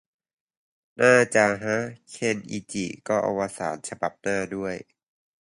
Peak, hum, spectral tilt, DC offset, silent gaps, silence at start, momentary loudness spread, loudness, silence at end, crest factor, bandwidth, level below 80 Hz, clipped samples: -4 dBFS; none; -4.5 dB/octave; under 0.1%; none; 1 s; 14 LU; -25 LUFS; 0.6 s; 22 dB; 11.5 kHz; -62 dBFS; under 0.1%